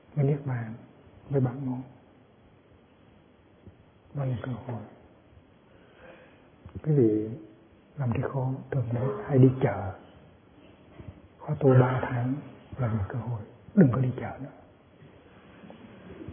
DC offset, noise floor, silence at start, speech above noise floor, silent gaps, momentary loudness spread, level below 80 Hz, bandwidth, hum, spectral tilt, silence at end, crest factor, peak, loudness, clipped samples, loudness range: under 0.1%; -58 dBFS; 0.15 s; 31 dB; none; 26 LU; -60 dBFS; 3.6 kHz; none; -12.5 dB/octave; 0 s; 22 dB; -8 dBFS; -28 LUFS; under 0.1%; 13 LU